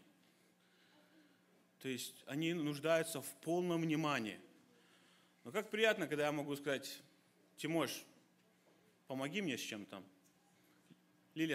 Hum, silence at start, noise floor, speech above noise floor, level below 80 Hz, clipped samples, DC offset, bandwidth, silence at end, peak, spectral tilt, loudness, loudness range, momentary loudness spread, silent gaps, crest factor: none; 1.8 s; -72 dBFS; 32 dB; -88 dBFS; under 0.1%; under 0.1%; 16 kHz; 0 s; -18 dBFS; -4.5 dB/octave; -40 LUFS; 5 LU; 15 LU; none; 24 dB